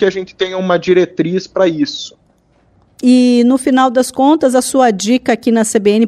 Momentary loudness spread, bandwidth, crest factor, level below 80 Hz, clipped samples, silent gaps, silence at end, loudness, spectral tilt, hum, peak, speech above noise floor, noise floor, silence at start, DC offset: 8 LU; 13.5 kHz; 12 dB; -54 dBFS; under 0.1%; none; 0 s; -12 LUFS; -4.5 dB/octave; none; 0 dBFS; 42 dB; -53 dBFS; 0 s; under 0.1%